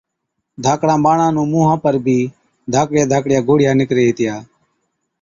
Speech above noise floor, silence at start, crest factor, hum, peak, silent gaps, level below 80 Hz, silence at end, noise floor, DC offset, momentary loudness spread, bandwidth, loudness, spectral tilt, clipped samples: 61 dB; 0.6 s; 14 dB; none; -2 dBFS; none; -52 dBFS; 0.8 s; -75 dBFS; under 0.1%; 8 LU; 7.6 kHz; -15 LUFS; -6.5 dB/octave; under 0.1%